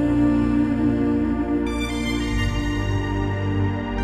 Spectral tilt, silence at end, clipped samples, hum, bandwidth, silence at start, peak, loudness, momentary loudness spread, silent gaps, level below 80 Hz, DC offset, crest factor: -7 dB/octave; 0 s; under 0.1%; none; 11.5 kHz; 0 s; -8 dBFS; -22 LUFS; 5 LU; none; -30 dBFS; under 0.1%; 14 dB